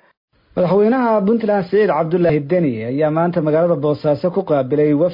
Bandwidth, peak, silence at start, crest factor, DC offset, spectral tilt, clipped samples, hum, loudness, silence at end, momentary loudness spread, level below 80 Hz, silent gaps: 5.4 kHz; -6 dBFS; 0.55 s; 10 dB; under 0.1%; -11 dB/octave; under 0.1%; none; -16 LUFS; 0 s; 4 LU; -54 dBFS; none